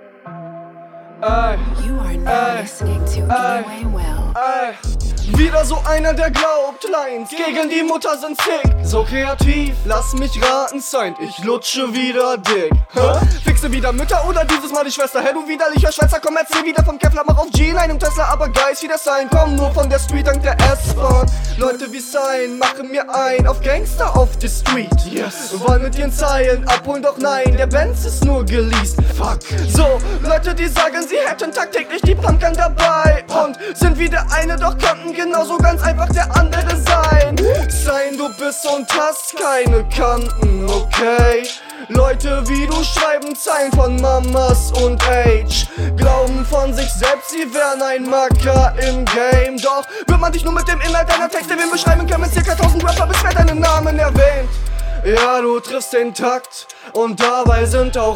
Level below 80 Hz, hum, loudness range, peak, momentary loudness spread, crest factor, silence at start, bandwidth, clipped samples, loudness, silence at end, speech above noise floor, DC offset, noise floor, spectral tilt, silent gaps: -18 dBFS; none; 3 LU; 0 dBFS; 6 LU; 14 dB; 0.25 s; 17 kHz; under 0.1%; -16 LUFS; 0 s; 22 dB; under 0.1%; -37 dBFS; -5 dB/octave; none